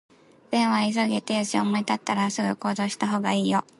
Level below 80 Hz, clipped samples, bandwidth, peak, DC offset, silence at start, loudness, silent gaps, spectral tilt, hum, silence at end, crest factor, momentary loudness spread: -70 dBFS; under 0.1%; 11.5 kHz; -10 dBFS; under 0.1%; 0.5 s; -25 LUFS; none; -4.5 dB/octave; none; 0.2 s; 16 dB; 4 LU